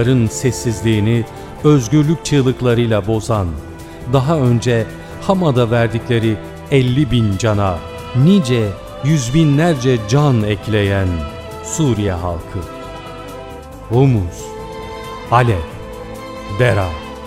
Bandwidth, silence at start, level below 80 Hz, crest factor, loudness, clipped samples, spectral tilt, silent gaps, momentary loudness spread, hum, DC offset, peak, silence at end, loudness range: 15 kHz; 0 s; -36 dBFS; 16 dB; -16 LUFS; under 0.1%; -6.5 dB/octave; none; 16 LU; none; under 0.1%; 0 dBFS; 0 s; 5 LU